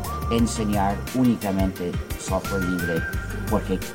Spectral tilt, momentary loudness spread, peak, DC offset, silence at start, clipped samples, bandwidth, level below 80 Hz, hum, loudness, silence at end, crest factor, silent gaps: -5.5 dB/octave; 7 LU; -8 dBFS; 0.2%; 0 s; under 0.1%; 17 kHz; -34 dBFS; none; -25 LUFS; 0 s; 16 dB; none